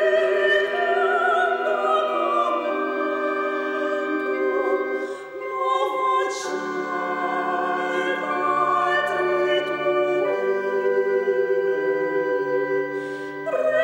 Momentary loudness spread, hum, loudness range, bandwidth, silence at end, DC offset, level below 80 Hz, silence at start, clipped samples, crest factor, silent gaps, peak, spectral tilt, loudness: 7 LU; none; 3 LU; 9.6 kHz; 0 s; under 0.1%; -70 dBFS; 0 s; under 0.1%; 14 dB; none; -8 dBFS; -4 dB/octave; -23 LUFS